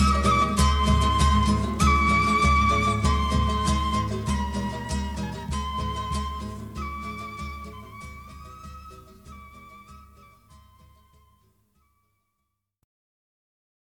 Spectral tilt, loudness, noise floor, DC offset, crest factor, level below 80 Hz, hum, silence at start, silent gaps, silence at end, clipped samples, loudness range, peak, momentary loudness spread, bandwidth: -5 dB/octave; -24 LUFS; -80 dBFS; under 0.1%; 18 dB; -30 dBFS; none; 0 s; none; 3.95 s; under 0.1%; 23 LU; -8 dBFS; 22 LU; 13.5 kHz